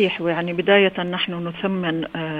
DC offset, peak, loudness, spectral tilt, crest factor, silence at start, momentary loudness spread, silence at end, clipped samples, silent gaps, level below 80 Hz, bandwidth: under 0.1%; 0 dBFS; -21 LUFS; -7.5 dB/octave; 20 dB; 0 s; 9 LU; 0 s; under 0.1%; none; -60 dBFS; 5 kHz